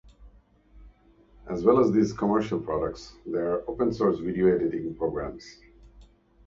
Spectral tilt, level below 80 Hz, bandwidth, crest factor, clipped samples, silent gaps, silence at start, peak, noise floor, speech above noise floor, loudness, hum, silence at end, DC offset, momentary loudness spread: -7.5 dB/octave; -50 dBFS; 7.6 kHz; 20 dB; under 0.1%; none; 0.2 s; -8 dBFS; -57 dBFS; 32 dB; -26 LUFS; 50 Hz at -50 dBFS; 0.45 s; under 0.1%; 14 LU